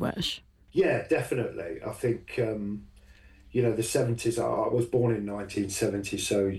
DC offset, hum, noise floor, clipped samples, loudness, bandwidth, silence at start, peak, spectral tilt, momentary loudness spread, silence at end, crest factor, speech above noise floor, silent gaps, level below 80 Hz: under 0.1%; none; -54 dBFS; under 0.1%; -29 LUFS; 14 kHz; 0 s; -12 dBFS; -5 dB/octave; 8 LU; 0 s; 16 dB; 26 dB; none; -54 dBFS